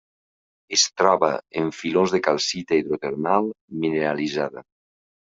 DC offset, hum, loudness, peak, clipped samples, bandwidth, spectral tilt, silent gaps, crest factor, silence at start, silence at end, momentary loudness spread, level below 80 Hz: under 0.1%; none; -22 LUFS; -2 dBFS; under 0.1%; 7.8 kHz; -3 dB/octave; 3.61-3.68 s; 20 dB; 0.7 s; 0.65 s; 9 LU; -64 dBFS